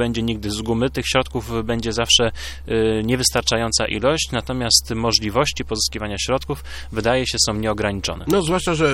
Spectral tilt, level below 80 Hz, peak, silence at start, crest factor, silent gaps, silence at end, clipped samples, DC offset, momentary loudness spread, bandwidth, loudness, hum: -3.5 dB/octave; -36 dBFS; 0 dBFS; 0 s; 20 dB; none; 0 s; under 0.1%; under 0.1%; 9 LU; 16.5 kHz; -20 LUFS; none